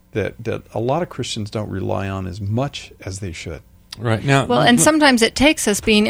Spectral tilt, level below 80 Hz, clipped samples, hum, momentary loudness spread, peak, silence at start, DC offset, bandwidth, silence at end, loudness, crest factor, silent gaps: -4 dB/octave; -42 dBFS; under 0.1%; none; 18 LU; 0 dBFS; 0.15 s; under 0.1%; 16 kHz; 0 s; -18 LUFS; 18 dB; none